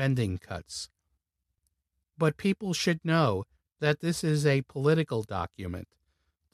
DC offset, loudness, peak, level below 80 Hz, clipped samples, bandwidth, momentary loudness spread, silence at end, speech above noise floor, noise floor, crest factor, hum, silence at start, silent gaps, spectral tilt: under 0.1%; -29 LUFS; -12 dBFS; -58 dBFS; under 0.1%; 14 kHz; 13 LU; 0.7 s; 53 dB; -81 dBFS; 18 dB; none; 0 s; none; -6 dB/octave